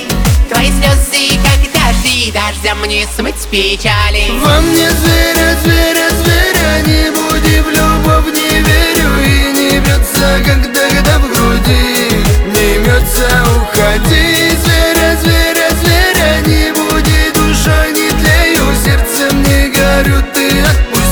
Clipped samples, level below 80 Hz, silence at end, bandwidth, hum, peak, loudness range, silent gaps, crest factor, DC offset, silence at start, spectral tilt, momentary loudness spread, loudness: under 0.1%; -14 dBFS; 0 s; over 20 kHz; none; 0 dBFS; 2 LU; none; 10 dB; under 0.1%; 0 s; -4 dB/octave; 3 LU; -9 LUFS